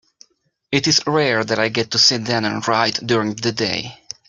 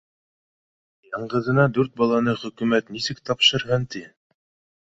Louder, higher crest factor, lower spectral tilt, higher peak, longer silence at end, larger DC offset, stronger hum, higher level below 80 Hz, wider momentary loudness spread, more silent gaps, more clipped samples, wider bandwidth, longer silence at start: first, -17 LUFS vs -21 LUFS; about the same, 18 dB vs 20 dB; second, -3 dB/octave vs -5 dB/octave; about the same, -2 dBFS vs -4 dBFS; second, 0.35 s vs 0.8 s; neither; neither; about the same, -58 dBFS vs -56 dBFS; second, 8 LU vs 15 LU; neither; neither; first, 12 kHz vs 8 kHz; second, 0.7 s vs 1.1 s